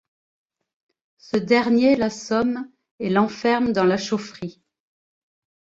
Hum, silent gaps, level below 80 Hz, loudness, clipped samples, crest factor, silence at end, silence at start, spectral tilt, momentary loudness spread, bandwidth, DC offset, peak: none; 2.91-2.98 s; -60 dBFS; -21 LUFS; under 0.1%; 18 dB; 1.25 s; 1.35 s; -5.5 dB/octave; 15 LU; 7.8 kHz; under 0.1%; -6 dBFS